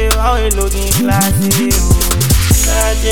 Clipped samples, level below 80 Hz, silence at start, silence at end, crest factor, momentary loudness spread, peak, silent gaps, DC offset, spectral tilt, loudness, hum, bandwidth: under 0.1%; -16 dBFS; 0 s; 0 s; 12 dB; 3 LU; 0 dBFS; none; 3%; -4 dB/octave; -12 LUFS; none; 19.5 kHz